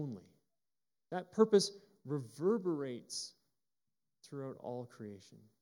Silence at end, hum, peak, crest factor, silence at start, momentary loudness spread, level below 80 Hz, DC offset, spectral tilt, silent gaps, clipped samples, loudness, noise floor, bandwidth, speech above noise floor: 0.25 s; none; -16 dBFS; 22 dB; 0 s; 21 LU; under -90 dBFS; under 0.1%; -5 dB/octave; none; under 0.1%; -37 LUFS; under -90 dBFS; 12.5 kHz; over 53 dB